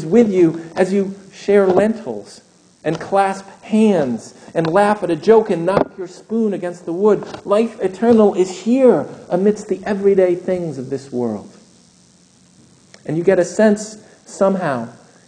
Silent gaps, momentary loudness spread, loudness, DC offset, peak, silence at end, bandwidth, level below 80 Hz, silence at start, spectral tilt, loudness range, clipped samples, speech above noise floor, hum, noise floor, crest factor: none; 13 LU; -17 LUFS; under 0.1%; 0 dBFS; 0.35 s; 9.8 kHz; -58 dBFS; 0 s; -6.5 dB/octave; 5 LU; under 0.1%; 35 dB; none; -51 dBFS; 16 dB